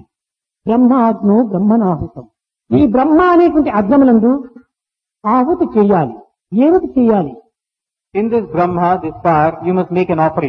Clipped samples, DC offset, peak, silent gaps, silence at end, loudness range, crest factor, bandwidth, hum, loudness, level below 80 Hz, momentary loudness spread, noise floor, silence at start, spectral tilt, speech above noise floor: under 0.1%; under 0.1%; 0 dBFS; none; 0 s; 3 LU; 14 dB; 5.4 kHz; none; -13 LUFS; -44 dBFS; 10 LU; -85 dBFS; 0.65 s; -10.5 dB/octave; 73 dB